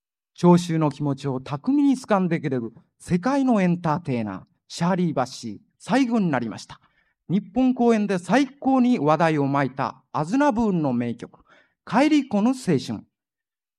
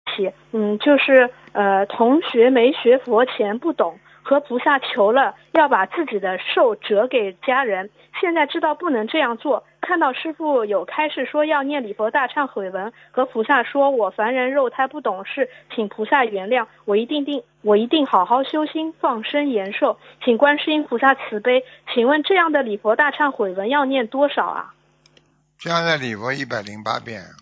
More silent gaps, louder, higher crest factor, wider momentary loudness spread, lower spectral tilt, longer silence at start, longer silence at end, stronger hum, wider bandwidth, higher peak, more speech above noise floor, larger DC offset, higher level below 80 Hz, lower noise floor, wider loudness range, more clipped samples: neither; second, -22 LUFS vs -19 LUFS; about the same, 20 dB vs 18 dB; first, 14 LU vs 9 LU; first, -7 dB/octave vs -5.5 dB/octave; first, 0.4 s vs 0.05 s; first, 0.8 s vs 0.15 s; neither; first, 11.5 kHz vs 7.6 kHz; about the same, -4 dBFS vs -2 dBFS; first, over 68 dB vs 39 dB; neither; first, -60 dBFS vs -72 dBFS; first, under -90 dBFS vs -58 dBFS; about the same, 3 LU vs 4 LU; neither